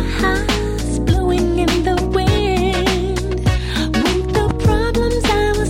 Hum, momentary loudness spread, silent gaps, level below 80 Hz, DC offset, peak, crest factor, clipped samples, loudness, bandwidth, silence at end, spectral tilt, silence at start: none; 3 LU; none; -22 dBFS; under 0.1%; -2 dBFS; 14 dB; under 0.1%; -17 LUFS; 16 kHz; 0 s; -5.5 dB/octave; 0 s